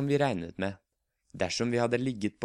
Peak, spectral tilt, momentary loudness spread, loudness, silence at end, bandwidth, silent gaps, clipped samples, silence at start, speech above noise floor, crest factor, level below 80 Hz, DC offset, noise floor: -14 dBFS; -5.5 dB/octave; 8 LU; -31 LUFS; 0 s; 11.5 kHz; none; under 0.1%; 0 s; 44 dB; 18 dB; -62 dBFS; under 0.1%; -74 dBFS